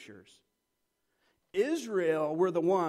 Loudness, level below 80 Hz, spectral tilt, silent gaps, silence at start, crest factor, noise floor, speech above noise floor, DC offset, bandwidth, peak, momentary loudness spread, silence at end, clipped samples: -30 LUFS; -80 dBFS; -6 dB/octave; none; 0 s; 16 dB; -81 dBFS; 51 dB; under 0.1%; 13 kHz; -16 dBFS; 4 LU; 0 s; under 0.1%